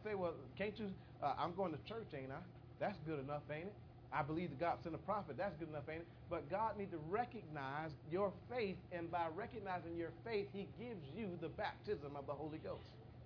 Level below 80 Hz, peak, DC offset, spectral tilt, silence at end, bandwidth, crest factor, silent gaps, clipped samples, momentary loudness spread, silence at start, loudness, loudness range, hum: -68 dBFS; -26 dBFS; under 0.1%; -5.5 dB/octave; 0 s; 5.4 kHz; 20 dB; none; under 0.1%; 8 LU; 0 s; -46 LUFS; 2 LU; none